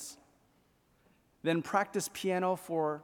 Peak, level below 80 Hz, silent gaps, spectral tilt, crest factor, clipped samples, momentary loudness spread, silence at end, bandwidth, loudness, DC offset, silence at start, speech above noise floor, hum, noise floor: -14 dBFS; -76 dBFS; none; -4.5 dB/octave; 22 dB; under 0.1%; 5 LU; 0 s; 19 kHz; -33 LUFS; under 0.1%; 0 s; 37 dB; none; -70 dBFS